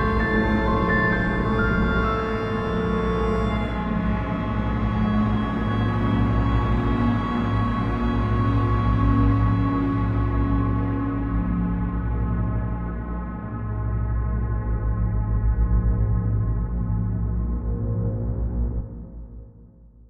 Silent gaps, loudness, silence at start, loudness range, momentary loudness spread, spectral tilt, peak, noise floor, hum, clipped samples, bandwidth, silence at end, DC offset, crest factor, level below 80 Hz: none; -24 LUFS; 0 s; 5 LU; 6 LU; -9.5 dB/octave; -8 dBFS; -48 dBFS; 60 Hz at -35 dBFS; under 0.1%; 6 kHz; 0.25 s; under 0.1%; 14 dB; -28 dBFS